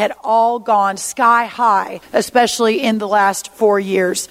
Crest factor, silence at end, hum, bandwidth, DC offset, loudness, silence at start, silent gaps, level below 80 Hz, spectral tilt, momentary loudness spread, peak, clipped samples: 14 dB; 0.05 s; none; 16 kHz; under 0.1%; -15 LUFS; 0 s; none; -60 dBFS; -3 dB/octave; 4 LU; 0 dBFS; under 0.1%